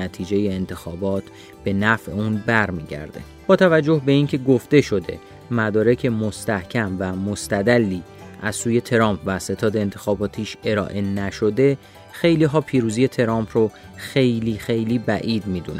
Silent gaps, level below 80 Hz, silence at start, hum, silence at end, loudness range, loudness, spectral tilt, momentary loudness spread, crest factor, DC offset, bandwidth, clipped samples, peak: none; -50 dBFS; 0 s; none; 0 s; 4 LU; -21 LUFS; -6 dB/octave; 11 LU; 20 dB; under 0.1%; 16 kHz; under 0.1%; -2 dBFS